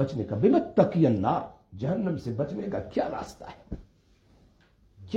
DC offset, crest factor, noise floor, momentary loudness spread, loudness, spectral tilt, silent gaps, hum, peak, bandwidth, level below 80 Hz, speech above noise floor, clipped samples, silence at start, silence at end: under 0.1%; 20 dB; -61 dBFS; 21 LU; -27 LUFS; -9 dB/octave; none; none; -8 dBFS; 8.8 kHz; -54 dBFS; 35 dB; under 0.1%; 0 s; 0 s